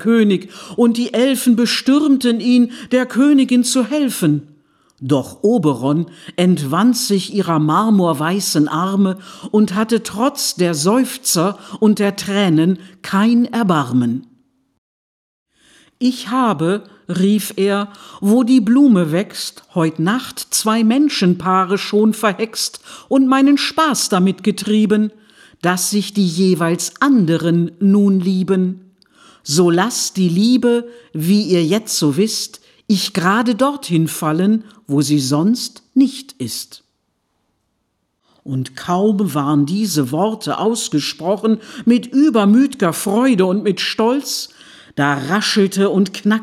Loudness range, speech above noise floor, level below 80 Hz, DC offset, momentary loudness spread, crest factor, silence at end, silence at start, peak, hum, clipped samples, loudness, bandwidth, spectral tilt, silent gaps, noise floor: 5 LU; 54 dB; -64 dBFS; under 0.1%; 8 LU; 14 dB; 0 s; 0 s; -2 dBFS; none; under 0.1%; -16 LUFS; 15.5 kHz; -5 dB/octave; 14.78-15.46 s; -69 dBFS